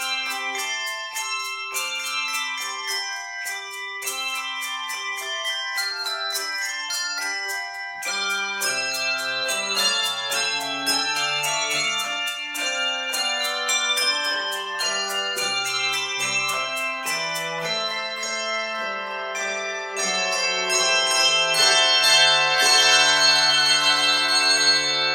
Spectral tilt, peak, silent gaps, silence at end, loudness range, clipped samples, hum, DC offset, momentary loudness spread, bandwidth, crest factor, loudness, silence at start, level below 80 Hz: 1 dB/octave; -4 dBFS; none; 0 s; 11 LU; under 0.1%; none; under 0.1%; 12 LU; 17 kHz; 20 dB; -21 LUFS; 0 s; -72 dBFS